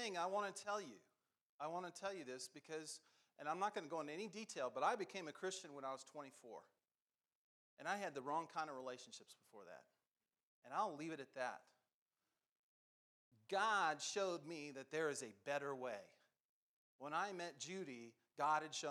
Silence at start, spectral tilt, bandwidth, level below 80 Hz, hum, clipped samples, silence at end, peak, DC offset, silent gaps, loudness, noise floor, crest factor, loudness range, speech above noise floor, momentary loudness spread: 0 s; -3 dB/octave; 13.5 kHz; under -90 dBFS; none; under 0.1%; 0 s; -28 dBFS; under 0.1%; 1.41-1.59 s, 6.91-7.07 s, 7.35-7.77 s, 10.07-10.12 s, 10.43-10.62 s, 11.94-12.06 s, 12.49-13.31 s, 16.40-16.99 s; -46 LUFS; under -90 dBFS; 20 dB; 7 LU; over 44 dB; 16 LU